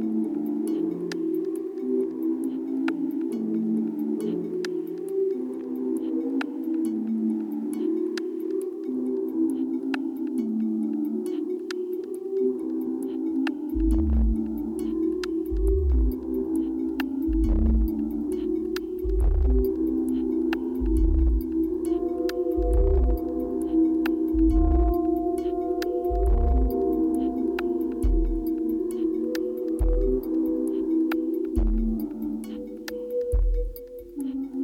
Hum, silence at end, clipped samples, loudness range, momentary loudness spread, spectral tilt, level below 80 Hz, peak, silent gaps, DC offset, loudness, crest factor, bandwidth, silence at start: none; 0 s; under 0.1%; 4 LU; 7 LU; -8.5 dB/octave; -30 dBFS; -12 dBFS; none; under 0.1%; -27 LUFS; 14 dB; 16.5 kHz; 0 s